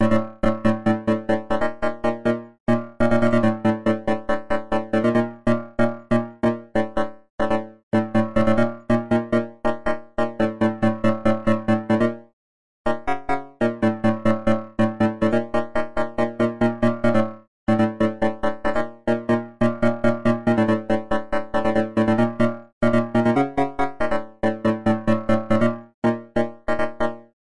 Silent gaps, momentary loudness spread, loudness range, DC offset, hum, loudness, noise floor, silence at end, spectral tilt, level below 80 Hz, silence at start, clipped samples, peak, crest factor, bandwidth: 2.60-2.66 s, 7.30-7.38 s, 7.83-7.91 s, 12.33-12.85 s, 17.48-17.67 s, 22.73-22.81 s, 25.94-26.02 s; 6 LU; 2 LU; under 0.1%; none; -22 LUFS; under -90 dBFS; 0.2 s; -8 dB/octave; -44 dBFS; 0 s; under 0.1%; -8 dBFS; 14 dB; 10.5 kHz